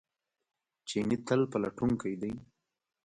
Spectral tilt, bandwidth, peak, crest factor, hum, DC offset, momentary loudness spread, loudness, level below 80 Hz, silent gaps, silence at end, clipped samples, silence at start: -6.5 dB/octave; 10.5 kHz; -14 dBFS; 20 dB; none; under 0.1%; 11 LU; -33 LUFS; -62 dBFS; none; 0.6 s; under 0.1%; 0.85 s